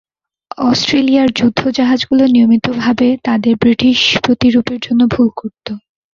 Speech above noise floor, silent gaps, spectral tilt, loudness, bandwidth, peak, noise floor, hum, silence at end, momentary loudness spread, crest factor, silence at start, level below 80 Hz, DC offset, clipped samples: 22 dB; none; -5 dB/octave; -12 LUFS; 7.4 kHz; 0 dBFS; -34 dBFS; none; 0.35 s; 11 LU; 12 dB; 0.6 s; -44 dBFS; under 0.1%; under 0.1%